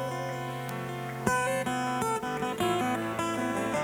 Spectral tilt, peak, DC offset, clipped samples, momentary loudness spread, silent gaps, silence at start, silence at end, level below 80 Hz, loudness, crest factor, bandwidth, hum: -4.5 dB/octave; -10 dBFS; under 0.1%; under 0.1%; 7 LU; none; 0 s; 0 s; -60 dBFS; -31 LUFS; 20 dB; over 20 kHz; none